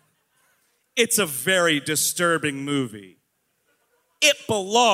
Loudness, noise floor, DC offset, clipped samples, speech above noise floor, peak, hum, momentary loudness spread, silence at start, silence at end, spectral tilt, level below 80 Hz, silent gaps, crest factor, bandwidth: -21 LUFS; -71 dBFS; under 0.1%; under 0.1%; 50 dB; -4 dBFS; none; 7 LU; 0.95 s; 0 s; -2 dB/octave; -70 dBFS; none; 20 dB; 16 kHz